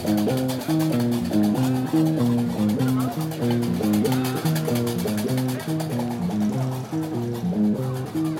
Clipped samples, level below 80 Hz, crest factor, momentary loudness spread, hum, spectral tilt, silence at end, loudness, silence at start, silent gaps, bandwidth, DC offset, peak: under 0.1%; -56 dBFS; 12 dB; 5 LU; none; -6.5 dB/octave; 0 s; -23 LUFS; 0 s; none; 17 kHz; under 0.1%; -10 dBFS